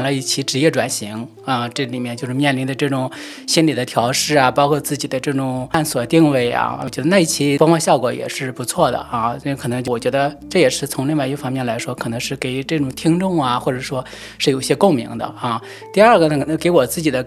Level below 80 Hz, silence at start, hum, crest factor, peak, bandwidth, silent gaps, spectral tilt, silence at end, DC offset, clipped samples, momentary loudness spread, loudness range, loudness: -50 dBFS; 0 s; none; 18 dB; 0 dBFS; 15.5 kHz; none; -4.5 dB/octave; 0 s; under 0.1%; under 0.1%; 10 LU; 4 LU; -18 LUFS